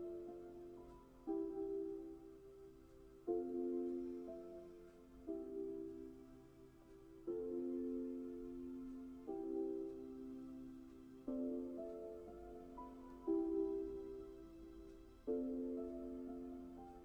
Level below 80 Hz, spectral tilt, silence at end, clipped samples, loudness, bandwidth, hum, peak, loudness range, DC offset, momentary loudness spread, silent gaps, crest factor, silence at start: -68 dBFS; -8.5 dB/octave; 0 s; under 0.1%; -47 LUFS; 8.8 kHz; none; -30 dBFS; 4 LU; under 0.1%; 17 LU; none; 16 dB; 0 s